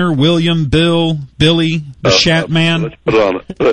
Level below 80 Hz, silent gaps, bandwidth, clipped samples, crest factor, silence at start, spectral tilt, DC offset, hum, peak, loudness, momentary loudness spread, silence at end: -36 dBFS; none; 9.4 kHz; under 0.1%; 12 dB; 0 s; -5.5 dB/octave; under 0.1%; none; 0 dBFS; -12 LUFS; 6 LU; 0 s